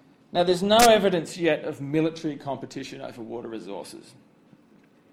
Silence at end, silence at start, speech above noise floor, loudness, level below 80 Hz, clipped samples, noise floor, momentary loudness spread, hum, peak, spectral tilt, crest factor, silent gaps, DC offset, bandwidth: 1.15 s; 0.35 s; 33 dB; -23 LUFS; -56 dBFS; under 0.1%; -57 dBFS; 20 LU; none; -4 dBFS; -4 dB/octave; 22 dB; none; under 0.1%; 16.5 kHz